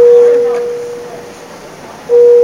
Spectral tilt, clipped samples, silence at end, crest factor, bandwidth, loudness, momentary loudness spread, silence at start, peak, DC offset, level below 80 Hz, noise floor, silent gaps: -4.5 dB/octave; under 0.1%; 0 s; 10 dB; 10.5 kHz; -10 LUFS; 24 LU; 0 s; 0 dBFS; 0.2%; -56 dBFS; -31 dBFS; none